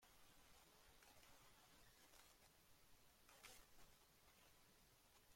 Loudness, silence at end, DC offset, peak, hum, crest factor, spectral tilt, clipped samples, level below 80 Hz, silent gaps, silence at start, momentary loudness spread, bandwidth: -68 LUFS; 0 s; under 0.1%; -48 dBFS; none; 22 dB; -2 dB/octave; under 0.1%; -80 dBFS; none; 0 s; 5 LU; 16.5 kHz